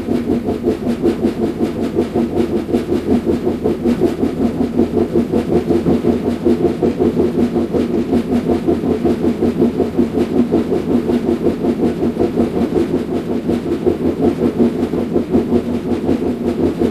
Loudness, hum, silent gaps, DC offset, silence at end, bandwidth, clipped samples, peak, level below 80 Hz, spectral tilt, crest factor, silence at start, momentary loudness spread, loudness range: -16 LUFS; none; none; under 0.1%; 0 s; 14 kHz; under 0.1%; 0 dBFS; -40 dBFS; -8 dB/octave; 16 dB; 0 s; 3 LU; 1 LU